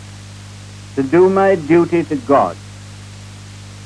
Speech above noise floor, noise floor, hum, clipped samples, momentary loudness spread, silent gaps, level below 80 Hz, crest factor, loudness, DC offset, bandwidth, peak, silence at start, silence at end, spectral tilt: 21 dB; -34 dBFS; 50 Hz at -35 dBFS; under 0.1%; 23 LU; none; -48 dBFS; 16 dB; -14 LUFS; under 0.1%; 11 kHz; -2 dBFS; 0 s; 0 s; -7 dB/octave